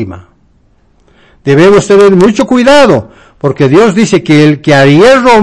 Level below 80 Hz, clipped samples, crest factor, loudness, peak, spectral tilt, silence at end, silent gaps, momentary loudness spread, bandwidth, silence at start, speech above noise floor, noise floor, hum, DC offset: -38 dBFS; 20%; 6 dB; -5 LUFS; 0 dBFS; -6 dB/octave; 0 s; none; 9 LU; 11 kHz; 0 s; 42 dB; -47 dBFS; none; under 0.1%